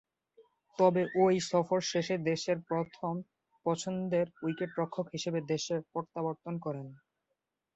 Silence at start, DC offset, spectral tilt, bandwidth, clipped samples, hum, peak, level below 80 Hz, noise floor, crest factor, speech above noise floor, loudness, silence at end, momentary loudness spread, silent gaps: 0.4 s; under 0.1%; -5.5 dB/octave; 8.2 kHz; under 0.1%; none; -14 dBFS; -74 dBFS; -85 dBFS; 20 dB; 53 dB; -33 LUFS; 0.8 s; 11 LU; none